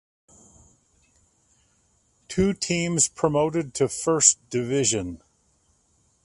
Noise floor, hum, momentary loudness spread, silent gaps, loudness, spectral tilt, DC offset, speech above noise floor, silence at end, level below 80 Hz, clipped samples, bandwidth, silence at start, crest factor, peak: -65 dBFS; none; 11 LU; none; -22 LUFS; -3.5 dB/octave; under 0.1%; 42 dB; 1.1 s; -52 dBFS; under 0.1%; 11.5 kHz; 2.3 s; 26 dB; -2 dBFS